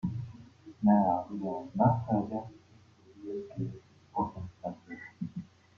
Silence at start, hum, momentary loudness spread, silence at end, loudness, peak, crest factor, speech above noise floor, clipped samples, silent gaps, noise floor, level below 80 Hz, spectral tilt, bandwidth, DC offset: 0.05 s; none; 20 LU; 0.35 s; -32 LUFS; -12 dBFS; 22 dB; 29 dB; under 0.1%; none; -59 dBFS; -64 dBFS; -10.5 dB/octave; 6.4 kHz; under 0.1%